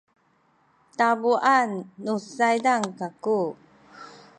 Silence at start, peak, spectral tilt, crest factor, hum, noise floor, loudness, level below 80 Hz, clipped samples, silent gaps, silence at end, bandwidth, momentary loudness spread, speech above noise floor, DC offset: 1 s; -6 dBFS; -4.5 dB/octave; 20 dB; none; -65 dBFS; -24 LUFS; -76 dBFS; under 0.1%; none; 0.3 s; 11 kHz; 13 LU; 41 dB; under 0.1%